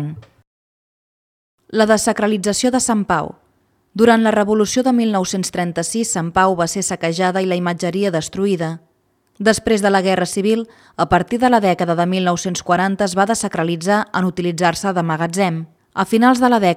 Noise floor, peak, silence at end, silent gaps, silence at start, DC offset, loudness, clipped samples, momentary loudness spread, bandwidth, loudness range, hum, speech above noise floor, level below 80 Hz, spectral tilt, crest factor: -62 dBFS; 0 dBFS; 0 s; 0.47-1.58 s; 0 s; under 0.1%; -17 LUFS; under 0.1%; 7 LU; 16 kHz; 3 LU; none; 45 dB; -50 dBFS; -4.5 dB/octave; 18 dB